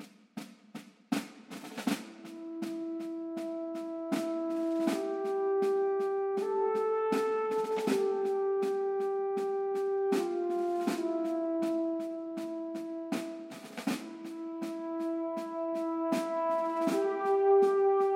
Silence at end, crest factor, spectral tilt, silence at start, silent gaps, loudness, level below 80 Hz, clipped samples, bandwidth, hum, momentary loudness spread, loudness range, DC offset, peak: 0 s; 16 dB; -5.5 dB/octave; 0 s; none; -32 LUFS; -88 dBFS; under 0.1%; 16 kHz; none; 12 LU; 7 LU; under 0.1%; -16 dBFS